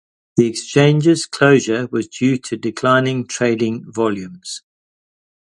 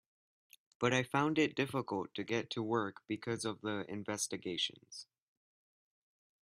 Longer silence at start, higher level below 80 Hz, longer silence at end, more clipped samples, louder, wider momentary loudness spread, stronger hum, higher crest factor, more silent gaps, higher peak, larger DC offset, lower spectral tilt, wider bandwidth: second, 0.35 s vs 0.8 s; first, -58 dBFS vs -78 dBFS; second, 0.9 s vs 1.4 s; neither; first, -17 LUFS vs -37 LUFS; first, 13 LU vs 9 LU; neither; about the same, 18 dB vs 22 dB; neither; first, 0 dBFS vs -16 dBFS; neither; first, -5.5 dB/octave vs -4 dB/octave; second, 11.5 kHz vs 14.5 kHz